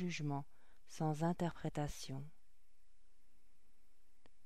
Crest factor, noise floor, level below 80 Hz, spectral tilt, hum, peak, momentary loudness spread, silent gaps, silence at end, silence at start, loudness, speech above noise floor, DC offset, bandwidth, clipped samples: 20 dB; -76 dBFS; -64 dBFS; -6 dB/octave; none; -26 dBFS; 19 LU; none; 2.15 s; 0 s; -42 LUFS; 35 dB; 0.3%; 14.5 kHz; under 0.1%